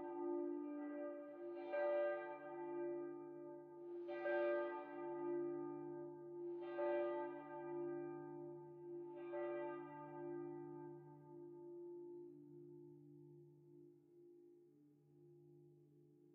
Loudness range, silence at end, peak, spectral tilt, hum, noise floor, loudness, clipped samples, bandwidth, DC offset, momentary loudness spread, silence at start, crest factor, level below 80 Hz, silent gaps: 16 LU; 0 s; -30 dBFS; -6 dB/octave; none; -71 dBFS; -48 LUFS; under 0.1%; 4.3 kHz; under 0.1%; 23 LU; 0 s; 18 dB; under -90 dBFS; none